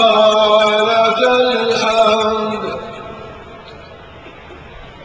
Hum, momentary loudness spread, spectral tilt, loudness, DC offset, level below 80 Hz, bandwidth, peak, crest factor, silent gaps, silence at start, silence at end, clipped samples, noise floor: none; 22 LU; -3.5 dB/octave; -13 LUFS; under 0.1%; -46 dBFS; 9.4 kHz; 0 dBFS; 14 dB; none; 0 s; 0 s; under 0.1%; -36 dBFS